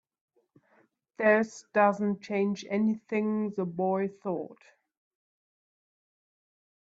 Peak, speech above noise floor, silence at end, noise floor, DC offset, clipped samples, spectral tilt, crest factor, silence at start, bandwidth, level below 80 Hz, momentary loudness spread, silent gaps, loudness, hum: -10 dBFS; 39 dB; 2.4 s; -67 dBFS; under 0.1%; under 0.1%; -7 dB/octave; 22 dB; 1.2 s; 7.8 kHz; -78 dBFS; 9 LU; none; -29 LUFS; none